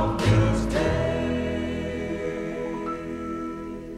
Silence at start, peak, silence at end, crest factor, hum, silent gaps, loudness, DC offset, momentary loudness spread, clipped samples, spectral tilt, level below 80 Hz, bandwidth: 0 s; -8 dBFS; 0 s; 18 dB; none; none; -26 LUFS; under 0.1%; 11 LU; under 0.1%; -7 dB/octave; -36 dBFS; 12.5 kHz